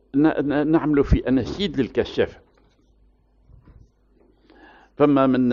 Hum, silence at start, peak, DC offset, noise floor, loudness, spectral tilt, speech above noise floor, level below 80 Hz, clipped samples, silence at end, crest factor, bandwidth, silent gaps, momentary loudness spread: none; 0.15 s; -6 dBFS; under 0.1%; -58 dBFS; -21 LUFS; -6 dB/octave; 39 dB; -36 dBFS; under 0.1%; 0 s; 18 dB; 7.2 kHz; none; 7 LU